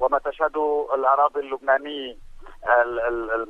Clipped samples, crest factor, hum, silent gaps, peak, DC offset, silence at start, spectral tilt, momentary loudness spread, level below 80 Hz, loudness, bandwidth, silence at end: under 0.1%; 16 dB; none; none; -6 dBFS; under 0.1%; 0 s; -5 dB/octave; 13 LU; -48 dBFS; -22 LUFS; 5.6 kHz; 0 s